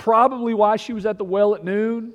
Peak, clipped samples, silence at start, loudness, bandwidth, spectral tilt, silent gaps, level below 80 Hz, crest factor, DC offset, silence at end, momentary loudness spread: -4 dBFS; under 0.1%; 0 s; -20 LUFS; 10 kHz; -6.5 dB/octave; none; -60 dBFS; 16 dB; under 0.1%; 0 s; 7 LU